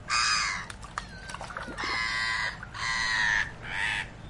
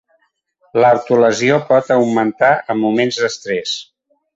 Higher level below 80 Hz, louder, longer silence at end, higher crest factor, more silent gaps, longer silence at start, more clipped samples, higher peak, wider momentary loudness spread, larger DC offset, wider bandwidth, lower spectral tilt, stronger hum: first, -48 dBFS vs -60 dBFS; second, -28 LUFS vs -15 LUFS; second, 0 s vs 0.5 s; about the same, 16 dB vs 14 dB; neither; second, 0 s vs 0.75 s; neither; second, -14 dBFS vs 0 dBFS; first, 14 LU vs 8 LU; neither; first, 11.5 kHz vs 8 kHz; second, -1 dB/octave vs -4.5 dB/octave; neither